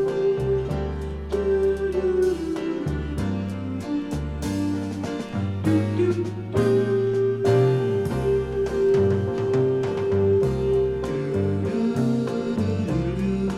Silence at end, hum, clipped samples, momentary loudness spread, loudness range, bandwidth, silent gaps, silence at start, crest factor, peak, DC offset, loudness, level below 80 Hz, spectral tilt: 0 s; none; under 0.1%; 8 LU; 4 LU; 12 kHz; none; 0 s; 14 dB; -8 dBFS; under 0.1%; -24 LUFS; -38 dBFS; -8 dB/octave